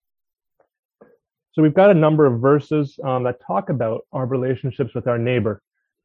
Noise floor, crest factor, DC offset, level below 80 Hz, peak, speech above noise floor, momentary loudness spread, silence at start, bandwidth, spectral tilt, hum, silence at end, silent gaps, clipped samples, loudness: -54 dBFS; 18 dB; under 0.1%; -56 dBFS; -2 dBFS; 36 dB; 11 LU; 1.55 s; 5.8 kHz; -10 dB/octave; none; 0.5 s; none; under 0.1%; -19 LUFS